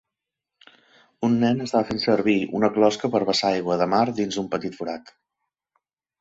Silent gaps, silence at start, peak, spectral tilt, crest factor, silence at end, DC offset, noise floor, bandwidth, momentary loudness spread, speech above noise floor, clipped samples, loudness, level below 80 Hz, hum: none; 1.2 s; -6 dBFS; -5.5 dB/octave; 18 dB; 1.1 s; under 0.1%; -85 dBFS; 8 kHz; 8 LU; 63 dB; under 0.1%; -23 LUFS; -62 dBFS; none